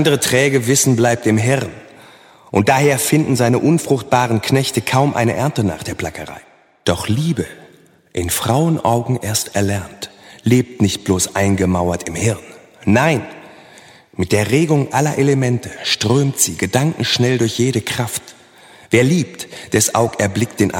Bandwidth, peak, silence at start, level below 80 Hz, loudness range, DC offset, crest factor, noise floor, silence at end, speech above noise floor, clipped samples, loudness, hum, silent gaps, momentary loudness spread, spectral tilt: 17 kHz; 0 dBFS; 0 s; -48 dBFS; 4 LU; under 0.1%; 16 dB; -48 dBFS; 0 s; 32 dB; under 0.1%; -16 LUFS; none; none; 11 LU; -4.5 dB/octave